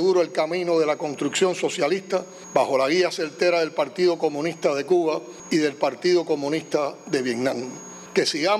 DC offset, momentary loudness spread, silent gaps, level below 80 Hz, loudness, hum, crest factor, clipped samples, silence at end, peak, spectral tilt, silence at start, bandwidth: under 0.1%; 5 LU; none; -74 dBFS; -23 LUFS; none; 18 dB; under 0.1%; 0 s; -4 dBFS; -4 dB/octave; 0 s; 12.5 kHz